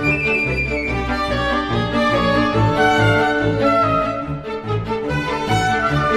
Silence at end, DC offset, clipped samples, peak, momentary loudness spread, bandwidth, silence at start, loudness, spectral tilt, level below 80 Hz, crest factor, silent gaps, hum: 0 s; under 0.1%; under 0.1%; -2 dBFS; 7 LU; 12.5 kHz; 0 s; -18 LUFS; -6 dB/octave; -34 dBFS; 14 dB; none; none